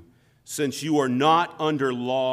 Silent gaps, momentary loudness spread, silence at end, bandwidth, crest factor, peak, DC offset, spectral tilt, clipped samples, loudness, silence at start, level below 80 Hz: none; 8 LU; 0 s; 16 kHz; 16 dB; -8 dBFS; under 0.1%; -5 dB/octave; under 0.1%; -23 LUFS; 0.5 s; -70 dBFS